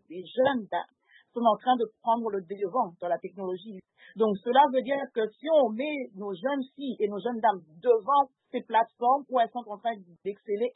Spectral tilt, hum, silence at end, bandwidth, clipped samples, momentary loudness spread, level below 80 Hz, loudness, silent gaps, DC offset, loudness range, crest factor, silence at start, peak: -9 dB/octave; none; 0.05 s; 4.1 kHz; under 0.1%; 13 LU; -84 dBFS; -28 LUFS; none; under 0.1%; 2 LU; 20 dB; 0.1 s; -8 dBFS